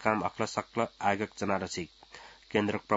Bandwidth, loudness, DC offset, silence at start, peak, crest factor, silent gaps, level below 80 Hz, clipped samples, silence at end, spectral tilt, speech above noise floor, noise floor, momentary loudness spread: 7.6 kHz; -32 LUFS; under 0.1%; 0 s; -8 dBFS; 24 dB; none; -66 dBFS; under 0.1%; 0 s; -4 dB/octave; 21 dB; -52 dBFS; 17 LU